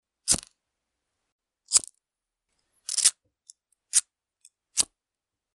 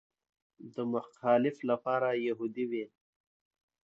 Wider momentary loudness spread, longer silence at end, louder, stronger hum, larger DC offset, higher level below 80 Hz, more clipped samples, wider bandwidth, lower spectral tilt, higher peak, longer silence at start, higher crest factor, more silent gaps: about the same, 9 LU vs 11 LU; second, 0.7 s vs 1 s; first, -24 LUFS vs -32 LUFS; neither; neither; first, -62 dBFS vs -84 dBFS; neither; first, 13 kHz vs 7.8 kHz; second, 1 dB/octave vs -7.5 dB/octave; first, -2 dBFS vs -14 dBFS; second, 0.25 s vs 0.6 s; first, 30 dB vs 20 dB; first, 1.32-1.39 s vs none